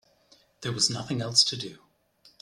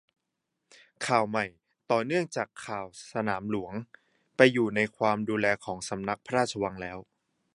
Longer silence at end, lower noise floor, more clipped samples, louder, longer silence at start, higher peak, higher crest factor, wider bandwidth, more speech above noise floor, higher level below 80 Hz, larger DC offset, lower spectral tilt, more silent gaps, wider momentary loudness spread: first, 0.65 s vs 0.5 s; second, -62 dBFS vs -83 dBFS; neither; first, -25 LUFS vs -29 LUFS; second, 0.6 s vs 1 s; about the same, -6 dBFS vs -4 dBFS; about the same, 26 dB vs 26 dB; first, 15 kHz vs 11.5 kHz; second, 35 dB vs 54 dB; about the same, -66 dBFS vs -64 dBFS; neither; second, -2.5 dB/octave vs -5 dB/octave; neither; about the same, 16 LU vs 15 LU